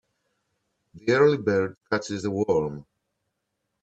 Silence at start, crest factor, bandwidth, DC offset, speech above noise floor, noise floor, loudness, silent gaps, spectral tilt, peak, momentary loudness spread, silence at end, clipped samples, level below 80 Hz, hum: 0.95 s; 20 dB; 8.2 kHz; under 0.1%; 56 dB; -80 dBFS; -24 LUFS; 1.77-1.81 s; -6 dB/octave; -6 dBFS; 12 LU; 1 s; under 0.1%; -62 dBFS; none